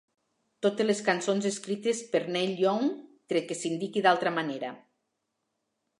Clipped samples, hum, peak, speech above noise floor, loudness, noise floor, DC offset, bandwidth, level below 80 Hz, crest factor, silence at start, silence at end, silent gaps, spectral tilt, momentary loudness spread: under 0.1%; none; -8 dBFS; 53 dB; -29 LUFS; -81 dBFS; under 0.1%; 11.5 kHz; -82 dBFS; 22 dB; 0.6 s; 1.2 s; none; -4 dB/octave; 8 LU